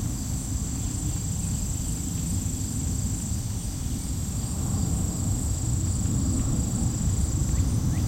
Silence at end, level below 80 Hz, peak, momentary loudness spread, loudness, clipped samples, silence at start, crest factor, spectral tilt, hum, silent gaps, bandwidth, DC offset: 0 s; -32 dBFS; -12 dBFS; 4 LU; -28 LUFS; under 0.1%; 0 s; 14 dB; -5 dB/octave; none; none; 16.5 kHz; under 0.1%